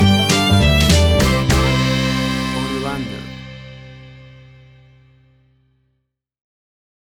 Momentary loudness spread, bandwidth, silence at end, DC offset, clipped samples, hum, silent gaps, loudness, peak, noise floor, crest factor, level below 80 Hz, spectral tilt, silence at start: 21 LU; 19.5 kHz; 2.95 s; under 0.1%; under 0.1%; none; none; -16 LUFS; -4 dBFS; -71 dBFS; 14 dB; -26 dBFS; -5 dB/octave; 0 s